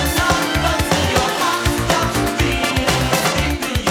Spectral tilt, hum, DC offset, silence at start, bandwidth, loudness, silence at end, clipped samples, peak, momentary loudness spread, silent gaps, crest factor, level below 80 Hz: -4 dB/octave; none; under 0.1%; 0 s; over 20 kHz; -17 LUFS; 0 s; under 0.1%; -2 dBFS; 2 LU; none; 16 dB; -28 dBFS